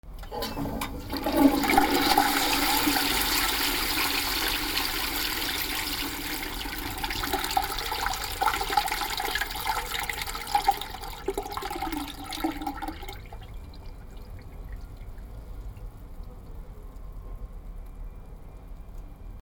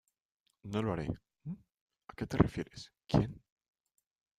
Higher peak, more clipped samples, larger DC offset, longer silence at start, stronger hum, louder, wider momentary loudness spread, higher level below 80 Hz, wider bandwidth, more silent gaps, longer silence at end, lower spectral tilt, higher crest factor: first, -6 dBFS vs -10 dBFS; neither; neither; second, 0.05 s vs 0.65 s; neither; first, -27 LUFS vs -35 LUFS; first, 23 LU vs 20 LU; first, -40 dBFS vs -54 dBFS; first, over 20 kHz vs 13.5 kHz; second, none vs 1.74-1.86 s; second, 0.05 s vs 1 s; second, -2.5 dB/octave vs -7.5 dB/octave; second, 22 dB vs 28 dB